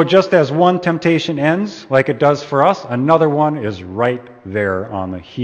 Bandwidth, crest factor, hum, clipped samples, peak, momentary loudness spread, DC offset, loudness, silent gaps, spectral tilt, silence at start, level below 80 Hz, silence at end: 8.6 kHz; 16 dB; none; under 0.1%; 0 dBFS; 11 LU; under 0.1%; -16 LUFS; none; -7 dB/octave; 0 s; -56 dBFS; 0 s